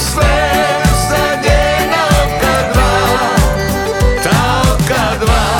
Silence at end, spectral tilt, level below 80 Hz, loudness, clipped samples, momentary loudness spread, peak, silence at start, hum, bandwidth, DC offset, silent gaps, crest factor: 0 s; -4.5 dB/octave; -18 dBFS; -12 LUFS; under 0.1%; 2 LU; 0 dBFS; 0 s; none; 19.5 kHz; under 0.1%; none; 12 dB